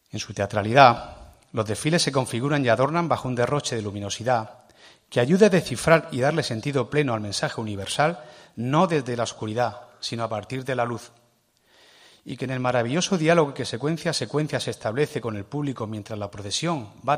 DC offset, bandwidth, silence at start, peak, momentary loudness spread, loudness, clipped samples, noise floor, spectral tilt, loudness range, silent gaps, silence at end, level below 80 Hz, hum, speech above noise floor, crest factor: under 0.1%; 15.5 kHz; 0.15 s; 0 dBFS; 13 LU; -24 LUFS; under 0.1%; -64 dBFS; -5 dB/octave; 6 LU; none; 0 s; -58 dBFS; none; 40 dB; 24 dB